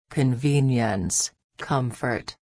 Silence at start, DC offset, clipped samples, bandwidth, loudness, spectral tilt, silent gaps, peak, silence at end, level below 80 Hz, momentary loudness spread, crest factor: 0.1 s; under 0.1%; under 0.1%; 11 kHz; -24 LUFS; -5 dB/octave; 1.44-1.49 s; -10 dBFS; 0.1 s; -52 dBFS; 7 LU; 14 dB